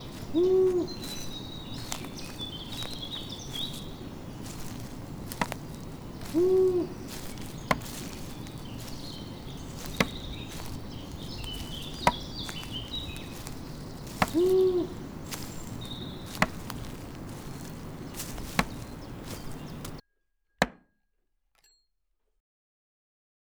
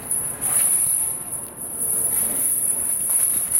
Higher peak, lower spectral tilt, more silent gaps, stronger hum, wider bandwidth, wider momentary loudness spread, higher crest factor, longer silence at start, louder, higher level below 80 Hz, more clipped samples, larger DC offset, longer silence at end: second, -10 dBFS vs -6 dBFS; first, -5 dB/octave vs -1 dB/octave; neither; neither; first, over 20 kHz vs 16 kHz; first, 16 LU vs 10 LU; first, 24 dB vs 16 dB; about the same, 0 s vs 0 s; second, -33 LUFS vs -19 LUFS; first, -48 dBFS vs -54 dBFS; neither; neither; first, 2.75 s vs 0 s